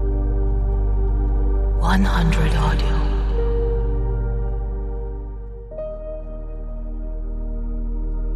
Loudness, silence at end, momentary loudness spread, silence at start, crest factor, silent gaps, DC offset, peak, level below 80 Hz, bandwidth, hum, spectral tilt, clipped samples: -24 LUFS; 0 s; 14 LU; 0 s; 14 dB; none; under 0.1%; -6 dBFS; -20 dBFS; 8.8 kHz; none; -7 dB/octave; under 0.1%